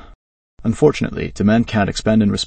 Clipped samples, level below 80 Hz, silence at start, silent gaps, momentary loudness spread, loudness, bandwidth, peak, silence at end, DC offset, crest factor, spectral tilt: under 0.1%; -38 dBFS; 0.6 s; none; 8 LU; -17 LUFS; 8.8 kHz; 0 dBFS; 0 s; under 0.1%; 16 dB; -6 dB/octave